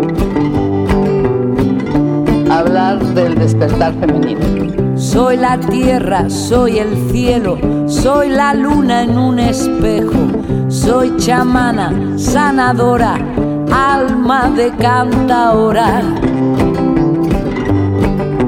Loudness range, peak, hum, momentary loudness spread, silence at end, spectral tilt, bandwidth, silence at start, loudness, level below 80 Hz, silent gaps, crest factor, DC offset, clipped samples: 1 LU; 0 dBFS; none; 4 LU; 0 s; -6.5 dB/octave; 16.5 kHz; 0 s; -12 LUFS; -26 dBFS; none; 12 dB; under 0.1%; under 0.1%